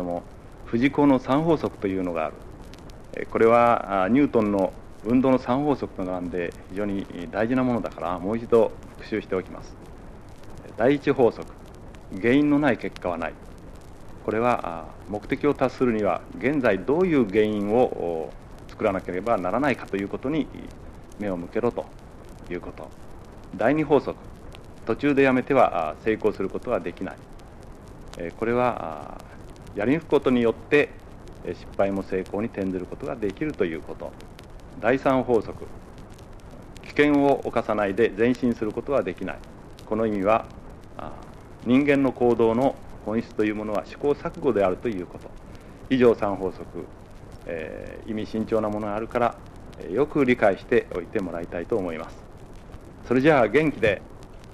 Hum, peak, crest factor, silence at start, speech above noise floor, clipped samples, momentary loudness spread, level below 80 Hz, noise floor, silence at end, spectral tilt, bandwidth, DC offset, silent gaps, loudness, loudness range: none; -4 dBFS; 20 dB; 0 s; 19 dB; under 0.1%; 24 LU; -46 dBFS; -43 dBFS; 0 s; -7.5 dB/octave; 12.5 kHz; under 0.1%; none; -24 LUFS; 5 LU